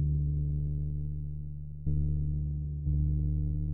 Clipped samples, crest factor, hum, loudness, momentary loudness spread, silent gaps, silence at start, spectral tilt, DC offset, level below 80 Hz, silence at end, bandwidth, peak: under 0.1%; 12 dB; none; -33 LUFS; 8 LU; none; 0 s; -20 dB/octave; 1%; -34 dBFS; 0 s; 0.8 kHz; -18 dBFS